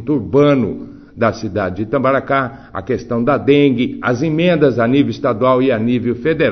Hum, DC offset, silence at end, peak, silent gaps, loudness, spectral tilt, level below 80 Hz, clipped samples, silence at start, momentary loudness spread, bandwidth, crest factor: none; under 0.1%; 0 s; 0 dBFS; none; -15 LUFS; -7.5 dB/octave; -46 dBFS; under 0.1%; 0 s; 9 LU; 6.4 kHz; 14 dB